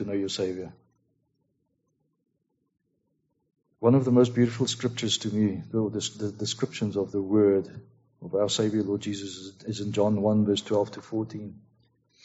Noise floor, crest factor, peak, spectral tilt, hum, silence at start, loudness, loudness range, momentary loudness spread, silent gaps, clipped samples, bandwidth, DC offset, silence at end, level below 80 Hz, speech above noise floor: -76 dBFS; 20 dB; -8 dBFS; -6 dB/octave; none; 0 s; -27 LUFS; 4 LU; 14 LU; none; under 0.1%; 8 kHz; under 0.1%; 0.7 s; -66 dBFS; 50 dB